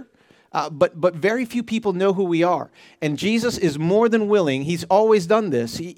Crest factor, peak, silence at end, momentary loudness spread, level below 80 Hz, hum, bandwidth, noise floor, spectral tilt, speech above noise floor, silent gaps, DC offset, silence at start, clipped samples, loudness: 18 dB; -2 dBFS; 0.05 s; 9 LU; -60 dBFS; none; 16 kHz; -55 dBFS; -6 dB/octave; 36 dB; none; under 0.1%; 0 s; under 0.1%; -20 LUFS